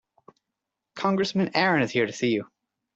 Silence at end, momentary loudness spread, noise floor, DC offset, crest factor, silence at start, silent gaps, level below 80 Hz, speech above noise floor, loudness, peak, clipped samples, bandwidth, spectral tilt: 0.5 s; 7 LU; -85 dBFS; under 0.1%; 22 dB; 0.95 s; none; -66 dBFS; 61 dB; -25 LUFS; -6 dBFS; under 0.1%; 8 kHz; -5.5 dB/octave